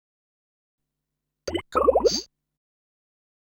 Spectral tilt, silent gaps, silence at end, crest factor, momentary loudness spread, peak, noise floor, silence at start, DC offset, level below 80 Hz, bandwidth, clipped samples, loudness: -3.5 dB/octave; none; 1.15 s; 22 dB; 12 LU; -6 dBFS; -83 dBFS; 1.45 s; under 0.1%; -50 dBFS; 18.5 kHz; under 0.1%; -23 LUFS